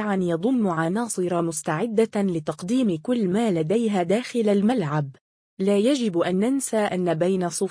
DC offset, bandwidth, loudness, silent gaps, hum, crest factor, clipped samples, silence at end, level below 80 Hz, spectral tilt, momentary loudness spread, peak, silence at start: under 0.1%; 10.5 kHz; -23 LUFS; 5.21-5.57 s; none; 14 dB; under 0.1%; 0 s; -66 dBFS; -6 dB/octave; 4 LU; -8 dBFS; 0 s